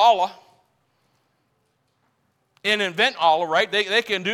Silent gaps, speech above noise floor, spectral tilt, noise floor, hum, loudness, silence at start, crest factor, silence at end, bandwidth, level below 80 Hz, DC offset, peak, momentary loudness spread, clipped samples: none; 48 dB; -2.5 dB/octave; -69 dBFS; none; -20 LUFS; 0 s; 18 dB; 0 s; 15.5 kHz; -72 dBFS; under 0.1%; -4 dBFS; 5 LU; under 0.1%